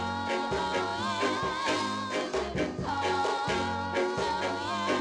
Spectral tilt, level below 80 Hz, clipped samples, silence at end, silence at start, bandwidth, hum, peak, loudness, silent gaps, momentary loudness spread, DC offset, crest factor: -4 dB/octave; -54 dBFS; under 0.1%; 0 s; 0 s; 12 kHz; none; -16 dBFS; -30 LUFS; none; 3 LU; under 0.1%; 14 dB